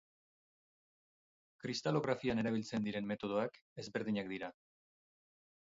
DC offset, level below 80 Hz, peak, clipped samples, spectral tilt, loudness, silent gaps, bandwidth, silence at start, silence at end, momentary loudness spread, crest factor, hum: under 0.1%; -72 dBFS; -20 dBFS; under 0.1%; -5 dB/octave; -39 LUFS; 3.62-3.76 s; 7.6 kHz; 1.65 s; 1.25 s; 10 LU; 22 dB; none